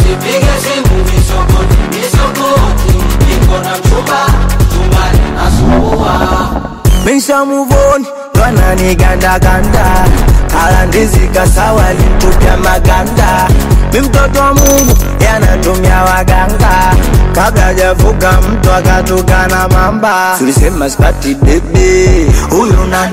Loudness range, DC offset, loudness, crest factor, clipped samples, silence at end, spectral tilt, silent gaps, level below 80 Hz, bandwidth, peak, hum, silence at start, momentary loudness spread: 2 LU; 1%; -9 LUFS; 6 dB; 0.4%; 0 s; -5.5 dB/octave; none; -10 dBFS; 16.5 kHz; 0 dBFS; none; 0 s; 3 LU